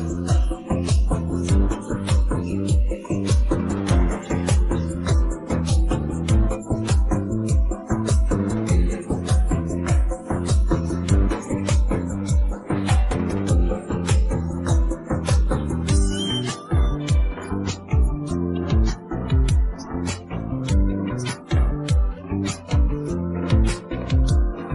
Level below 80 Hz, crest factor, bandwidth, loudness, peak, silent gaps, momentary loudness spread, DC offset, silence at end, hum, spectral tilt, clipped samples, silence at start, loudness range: -24 dBFS; 16 dB; 11.5 kHz; -23 LUFS; -6 dBFS; none; 5 LU; under 0.1%; 0 s; none; -6.5 dB/octave; under 0.1%; 0 s; 2 LU